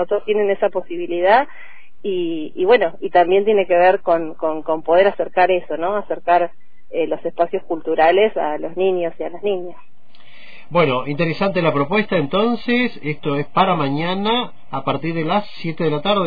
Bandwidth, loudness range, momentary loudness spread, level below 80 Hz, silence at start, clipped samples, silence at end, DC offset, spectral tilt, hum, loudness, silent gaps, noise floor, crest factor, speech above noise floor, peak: 5 kHz; 4 LU; 10 LU; -52 dBFS; 0 s; under 0.1%; 0 s; 4%; -8.5 dB/octave; none; -18 LUFS; none; -49 dBFS; 16 dB; 31 dB; -2 dBFS